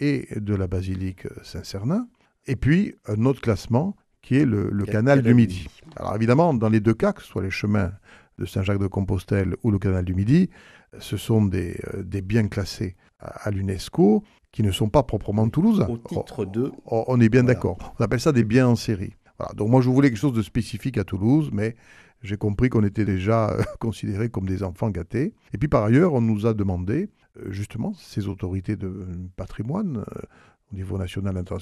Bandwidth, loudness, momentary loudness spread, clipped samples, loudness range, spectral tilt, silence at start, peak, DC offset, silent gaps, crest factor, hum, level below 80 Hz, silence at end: 13.5 kHz; -23 LUFS; 14 LU; under 0.1%; 6 LU; -8 dB/octave; 0 s; -4 dBFS; under 0.1%; none; 18 dB; none; -44 dBFS; 0 s